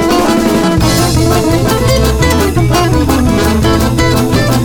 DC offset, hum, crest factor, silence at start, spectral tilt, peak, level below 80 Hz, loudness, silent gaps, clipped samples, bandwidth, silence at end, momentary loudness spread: under 0.1%; none; 10 dB; 0 s; -5.5 dB/octave; 0 dBFS; -18 dBFS; -10 LUFS; none; under 0.1%; 20 kHz; 0 s; 1 LU